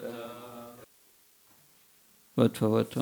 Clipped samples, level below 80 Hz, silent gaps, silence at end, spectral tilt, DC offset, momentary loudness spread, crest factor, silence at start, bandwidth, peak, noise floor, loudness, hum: under 0.1%; -74 dBFS; none; 0 s; -7 dB/octave; under 0.1%; 22 LU; 22 dB; 0 s; over 20 kHz; -10 dBFS; -62 dBFS; -29 LUFS; none